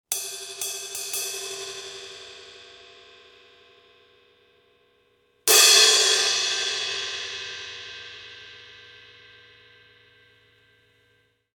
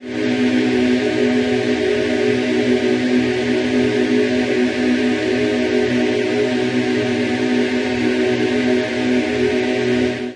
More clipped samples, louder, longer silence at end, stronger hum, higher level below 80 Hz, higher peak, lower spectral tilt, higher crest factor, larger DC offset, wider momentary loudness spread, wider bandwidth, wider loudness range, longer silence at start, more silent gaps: neither; second, -20 LUFS vs -17 LUFS; first, 2.8 s vs 0 s; neither; second, -72 dBFS vs -52 dBFS; first, -2 dBFS vs -6 dBFS; second, 2.5 dB/octave vs -5.5 dB/octave; first, 26 dB vs 12 dB; neither; first, 28 LU vs 2 LU; first, 18 kHz vs 10.5 kHz; first, 21 LU vs 1 LU; about the same, 0.1 s vs 0 s; neither